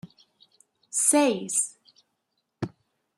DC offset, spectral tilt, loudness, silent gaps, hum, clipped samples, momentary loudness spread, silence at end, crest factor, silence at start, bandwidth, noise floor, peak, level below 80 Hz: under 0.1%; -3 dB/octave; -23 LUFS; none; none; under 0.1%; 17 LU; 0.5 s; 22 dB; 0.05 s; 14.5 kHz; -78 dBFS; -8 dBFS; -72 dBFS